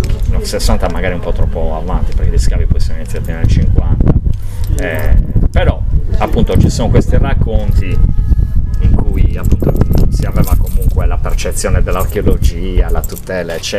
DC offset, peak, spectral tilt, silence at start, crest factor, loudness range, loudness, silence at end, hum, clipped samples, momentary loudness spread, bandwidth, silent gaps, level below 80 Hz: 2%; 0 dBFS; -6.5 dB/octave; 0 s; 10 dB; 2 LU; -15 LUFS; 0 s; none; 0.4%; 6 LU; 15 kHz; none; -12 dBFS